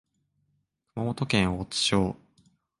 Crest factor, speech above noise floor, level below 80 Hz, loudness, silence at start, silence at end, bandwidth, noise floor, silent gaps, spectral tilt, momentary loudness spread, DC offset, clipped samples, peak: 20 dB; 48 dB; -50 dBFS; -27 LUFS; 0.95 s; 0.65 s; 11.5 kHz; -75 dBFS; none; -4.5 dB/octave; 13 LU; under 0.1%; under 0.1%; -10 dBFS